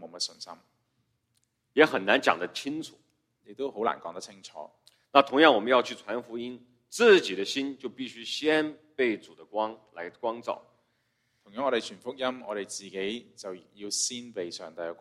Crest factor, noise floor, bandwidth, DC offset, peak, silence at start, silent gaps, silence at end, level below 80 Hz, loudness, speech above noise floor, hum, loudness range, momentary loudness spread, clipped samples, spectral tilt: 28 dB; -75 dBFS; 14.5 kHz; under 0.1%; -2 dBFS; 0 s; none; 0.05 s; -76 dBFS; -28 LUFS; 47 dB; none; 10 LU; 21 LU; under 0.1%; -2.5 dB/octave